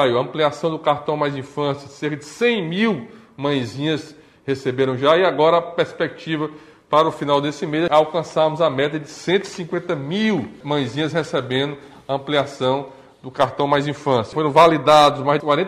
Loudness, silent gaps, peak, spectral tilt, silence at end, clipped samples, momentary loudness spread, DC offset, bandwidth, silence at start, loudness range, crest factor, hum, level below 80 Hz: -20 LUFS; none; -2 dBFS; -5.5 dB/octave; 0 s; under 0.1%; 12 LU; under 0.1%; 14 kHz; 0 s; 5 LU; 18 dB; none; -60 dBFS